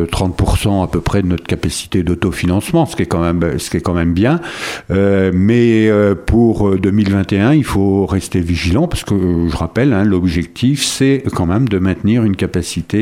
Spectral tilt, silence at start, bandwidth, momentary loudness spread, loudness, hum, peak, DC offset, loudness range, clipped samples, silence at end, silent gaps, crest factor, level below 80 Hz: -6.5 dB/octave; 0 s; 16 kHz; 6 LU; -14 LUFS; none; 0 dBFS; under 0.1%; 3 LU; under 0.1%; 0 s; none; 14 dB; -30 dBFS